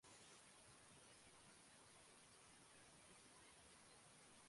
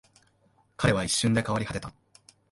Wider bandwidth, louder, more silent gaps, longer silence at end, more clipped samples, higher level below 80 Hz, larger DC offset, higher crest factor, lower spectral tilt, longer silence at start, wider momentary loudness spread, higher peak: about the same, 11.5 kHz vs 11.5 kHz; second, -66 LUFS vs -27 LUFS; neither; second, 0 s vs 0.6 s; neither; second, -86 dBFS vs -50 dBFS; neither; second, 14 dB vs 22 dB; second, -2 dB/octave vs -4.5 dB/octave; second, 0 s vs 0.8 s; second, 1 LU vs 12 LU; second, -54 dBFS vs -8 dBFS